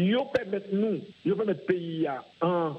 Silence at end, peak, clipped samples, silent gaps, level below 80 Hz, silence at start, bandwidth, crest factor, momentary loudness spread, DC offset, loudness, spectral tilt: 0 s; -12 dBFS; under 0.1%; none; -68 dBFS; 0 s; 7.4 kHz; 16 dB; 4 LU; under 0.1%; -29 LUFS; -8.5 dB/octave